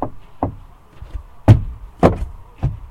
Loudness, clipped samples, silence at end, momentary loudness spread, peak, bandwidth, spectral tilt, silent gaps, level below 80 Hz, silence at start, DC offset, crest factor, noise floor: -18 LUFS; 0.3%; 0.05 s; 22 LU; 0 dBFS; 9.2 kHz; -9 dB/octave; none; -28 dBFS; 0 s; under 0.1%; 18 dB; -39 dBFS